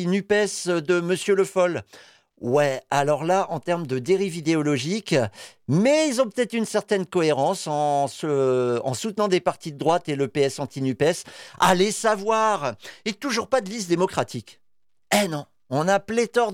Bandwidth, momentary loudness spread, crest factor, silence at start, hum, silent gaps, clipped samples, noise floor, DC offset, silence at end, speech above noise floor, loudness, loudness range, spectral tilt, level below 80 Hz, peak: 16.5 kHz; 8 LU; 16 dB; 0 s; none; none; under 0.1%; -73 dBFS; under 0.1%; 0 s; 51 dB; -23 LUFS; 2 LU; -5 dB/octave; -64 dBFS; -8 dBFS